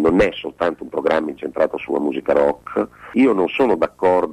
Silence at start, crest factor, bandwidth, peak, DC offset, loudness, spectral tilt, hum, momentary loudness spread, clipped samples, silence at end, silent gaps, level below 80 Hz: 0 s; 12 dB; 11 kHz; -6 dBFS; under 0.1%; -19 LUFS; -6.5 dB/octave; none; 7 LU; under 0.1%; 0 s; none; -46 dBFS